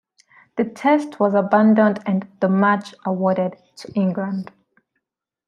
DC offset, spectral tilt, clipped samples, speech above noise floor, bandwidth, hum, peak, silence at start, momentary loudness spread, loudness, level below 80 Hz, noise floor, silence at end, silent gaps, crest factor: under 0.1%; -8 dB/octave; under 0.1%; 62 dB; 9.8 kHz; none; -2 dBFS; 0.55 s; 13 LU; -19 LUFS; -70 dBFS; -81 dBFS; 1.05 s; none; 18 dB